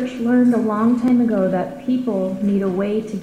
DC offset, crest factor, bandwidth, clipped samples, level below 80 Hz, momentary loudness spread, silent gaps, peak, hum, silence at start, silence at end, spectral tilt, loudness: under 0.1%; 10 dB; 9.4 kHz; under 0.1%; -54 dBFS; 6 LU; none; -8 dBFS; none; 0 s; 0 s; -8.5 dB/octave; -18 LUFS